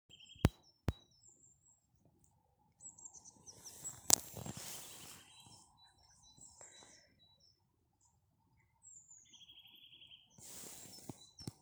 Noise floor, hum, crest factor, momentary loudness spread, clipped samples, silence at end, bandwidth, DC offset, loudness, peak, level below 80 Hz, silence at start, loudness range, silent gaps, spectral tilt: -78 dBFS; none; 44 dB; 22 LU; under 0.1%; 0.1 s; over 20 kHz; under 0.1%; -40 LUFS; -2 dBFS; -58 dBFS; 0.1 s; 22 LU; none; -3 dB/octave